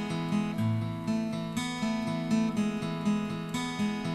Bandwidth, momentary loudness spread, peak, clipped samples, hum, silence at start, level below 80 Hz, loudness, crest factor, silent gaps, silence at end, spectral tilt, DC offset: 13.5 kHz; 4 LU; -18 dBFS; under 0.1%; none; 0 s; -58 dBFS; -31 LUFS; 12 dB; none; 0 s; -6 dB/octave; under 0.1%